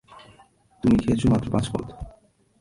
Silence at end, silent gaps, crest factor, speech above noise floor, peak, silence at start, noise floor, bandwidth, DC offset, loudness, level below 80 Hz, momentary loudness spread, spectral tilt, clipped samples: 0.5 s; none; 18 dB; 34 dB; -8 dBFS; 0.15 s; -56 dBFS; 11.5 kHz; under 0.1%; -23 LUFS; -40 dBFS; 20 LU; -7.5 dB/octave; under 0.1%